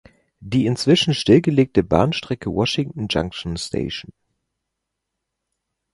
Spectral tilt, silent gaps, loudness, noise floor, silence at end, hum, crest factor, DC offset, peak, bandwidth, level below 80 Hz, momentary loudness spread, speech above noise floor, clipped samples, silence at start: -6 dB/octave; none; -20 LUFS; -80 dBFS; 1.9 s; none; 20 dB; under 0.1%; 0 dBFS; 11.5 kHz; -44 dBFS; 11 LU; 61 dB; under 0.1%; 0.4 s